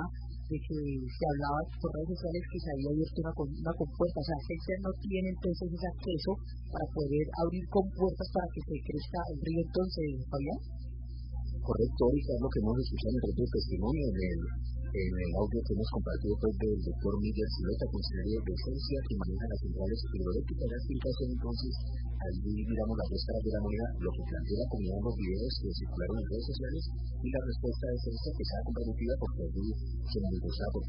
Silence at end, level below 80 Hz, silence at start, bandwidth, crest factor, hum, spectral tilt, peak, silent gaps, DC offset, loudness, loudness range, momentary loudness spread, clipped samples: 0 s; -38 dBFS; 0 s; 5.4 kHz; 18 dB; none; -11 dB/octave; -16 dBFS; none; under 0.1%; -35 LUFS; 3 LU; 6 LU; under 0.1%